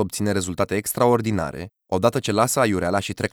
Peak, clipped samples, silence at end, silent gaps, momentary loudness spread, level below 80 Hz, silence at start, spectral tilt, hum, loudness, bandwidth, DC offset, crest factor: -4 dBFS; under 0.1%; 0.05 s; none; 8 LU; -50 dBFS; 0 s; -5 dB/octave; none; -22 LUFS; over 20 kHz; under 0.1%; 18 dB